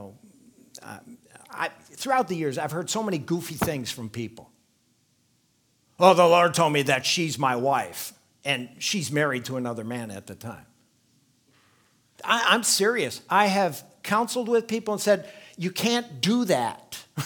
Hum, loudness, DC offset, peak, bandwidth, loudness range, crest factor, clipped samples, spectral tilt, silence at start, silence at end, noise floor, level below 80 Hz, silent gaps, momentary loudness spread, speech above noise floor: none; -24 LUFS; under 0.1%; -2 dBFS; 19.5 kHz; 9 LU; 24 dB; under 0.1%; -3.5 dB/octave; 0 s; 0 s; -67 dBFS; -66 dBFS; none; 18 LU; 43 dB